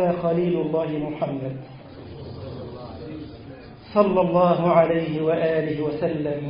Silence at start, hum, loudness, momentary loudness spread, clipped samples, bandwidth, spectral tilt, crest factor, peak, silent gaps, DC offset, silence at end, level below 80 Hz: 0 s; none; -22 LUFS; 21 LU; under 0.1%; 5.4 kHz; -12 dB/octave; 20 dB; -2 dBFS; none; under 0.1%; 0 s; -52 dBFS